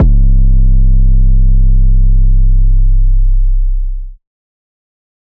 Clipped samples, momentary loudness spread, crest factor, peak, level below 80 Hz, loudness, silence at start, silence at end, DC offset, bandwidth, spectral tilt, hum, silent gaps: under 0.1%; 6 LU; 4 dB; -4 dBFS; -8 dBFS; -13 LUFS; 0 s; 1.15 s; under 0.1%; 0.6 kHz; -16 dB/octave; none; none